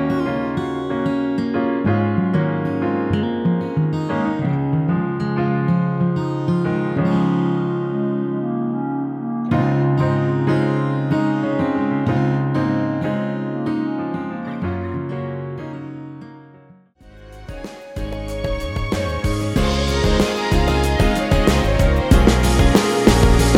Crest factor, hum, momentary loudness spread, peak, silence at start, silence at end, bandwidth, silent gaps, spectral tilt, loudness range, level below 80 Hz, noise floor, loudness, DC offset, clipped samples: 18 dB; none; 11 LU; 0 dBFS; 0 s; 0 s; 16.5 kHz; none; -6.5 dB/octave; 11 LU; -26 dBFS; -47 dBFS; -19 LUFS; under 0.1%; under 0.1%